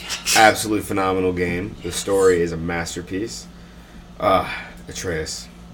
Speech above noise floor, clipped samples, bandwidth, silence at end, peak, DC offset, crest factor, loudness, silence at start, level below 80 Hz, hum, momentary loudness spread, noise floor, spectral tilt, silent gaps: 21 dB; under 0.1%; 19 kHz; 0 s; 0 dBFS; under 0.1%; 22 dB; -20 LUFS; 0 s; -44 dBFS; none; 16 LU; -41 dBFS; -3.5 dB/octave; none